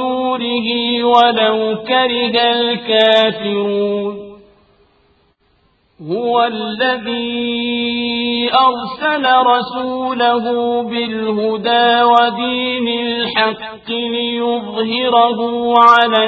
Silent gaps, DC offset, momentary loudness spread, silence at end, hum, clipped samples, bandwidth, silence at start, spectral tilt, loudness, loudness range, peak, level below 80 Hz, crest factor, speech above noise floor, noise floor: none; under 0.1%; 9 LU; 0 s; none; under 0.1%; 8 kHz; 0 s; -5.5 dB/octave; -14 LUFS; 7 LU; 0 dBFS; -58 dBFS; 16 dB; 43 dB; -58 dBFS